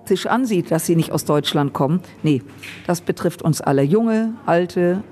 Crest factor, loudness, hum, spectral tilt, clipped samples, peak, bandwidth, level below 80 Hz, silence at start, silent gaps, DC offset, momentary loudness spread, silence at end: 14 dB; -19 LUFS; none; -6 dB/octave; under 0.1%; -4 dBFS; 14 kHz; -58 dBFS; 0.05 s; none; under 0.1%; 6 LU; 0.05 s